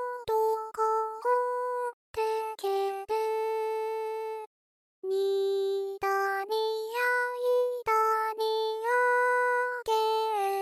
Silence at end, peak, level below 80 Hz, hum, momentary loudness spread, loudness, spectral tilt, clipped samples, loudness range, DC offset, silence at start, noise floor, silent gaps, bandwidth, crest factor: 0 s; -16 dBFS; -70 dBFS; none; 8 LU; -29 LUFS; -2 dB/octave; under 0.1%; 5 LU; under 0.1%; 0 s; under -90 dBFS; 1.93-2.14 s, 4.47-5.02 s; 15 kHz; 14 dB